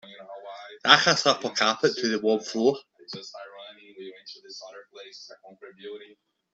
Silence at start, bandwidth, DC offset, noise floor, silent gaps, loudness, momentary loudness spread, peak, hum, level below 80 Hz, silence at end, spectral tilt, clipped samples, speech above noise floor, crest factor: 0.1 s; 8 kHz; under 0.1%; -45 dBFS; none; -22 LUFS; 26 LU; 0 dBFS; none; -72 dBFS; 0.5 s; -2.5 dB/octave; under 0.1%; 19 dB; 28 dB